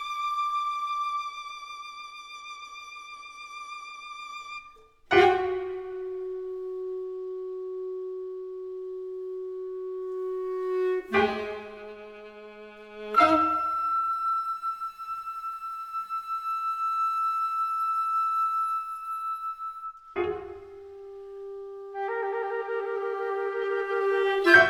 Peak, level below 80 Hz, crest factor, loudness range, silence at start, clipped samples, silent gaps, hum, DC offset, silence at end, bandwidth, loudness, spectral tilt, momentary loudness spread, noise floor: -4 dBFS; -64 dBFS; 26 dB; 9 LU; 0 s; under 0.1%; none; none; under 0.1%; 0 s; 13.5 kHz; -29 LUFS; -4.5 dB/octave; 16 LU; -53 dBFS